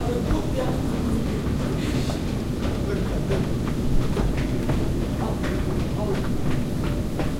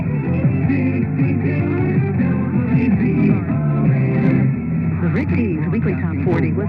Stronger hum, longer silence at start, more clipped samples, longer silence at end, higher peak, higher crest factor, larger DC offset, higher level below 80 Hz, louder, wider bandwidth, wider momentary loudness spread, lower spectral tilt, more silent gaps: neither; about the same, 0 s vs 0 s; neither; about the same, 0 s vs 0 s; second, -10 dBFS vs -2 dBFS; about the same, 14 dB vs 14 dB; neither; first, -30 dBFS vs -44 dBFS; second, -26 LUFS vs -18 LUFS; first, 16 kHz vs 4.9 kHz; about the same, 2 LU vs 3 LU; second, -7 dB/octave vs -12 dB/octave; neither